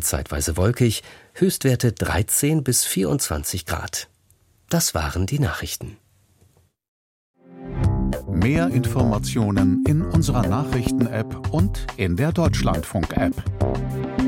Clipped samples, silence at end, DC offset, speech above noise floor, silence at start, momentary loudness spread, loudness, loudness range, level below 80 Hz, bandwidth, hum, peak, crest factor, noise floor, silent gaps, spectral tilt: under 0.1%; 0 s; under 0.1%; 38 dB; 0 s; 8 LU; -22 LUFS; 6 LU; -34 dBFS; 16.5 kHz; none; -6 dBFS; 16 dB; -59 dBFS; 6.88-7.34 s; -5 dB/octave